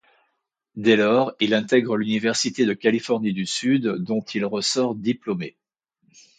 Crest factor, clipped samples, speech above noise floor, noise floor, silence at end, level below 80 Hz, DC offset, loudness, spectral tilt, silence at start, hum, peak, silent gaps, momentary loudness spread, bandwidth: 18 dB; under 0.1%; 54 dB; -75 dBFS; 0.9 s; -68 dBFS; under 0.1%; -22 LUFS; -4.5 dB/octave; 0.75 s; none; -4 dBFS; none; 8 LU; 9.4 kHz